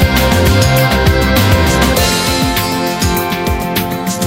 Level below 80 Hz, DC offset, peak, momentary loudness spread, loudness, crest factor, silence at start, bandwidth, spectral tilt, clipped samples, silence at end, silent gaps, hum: -20 dBFS; under 0.1%; 0 dBFS; 6 LU; -12 LUFS; 12 dB; 0 s; 16.5 kHz; -4.5 dB/octave; under 0.1%; 0 s; none; none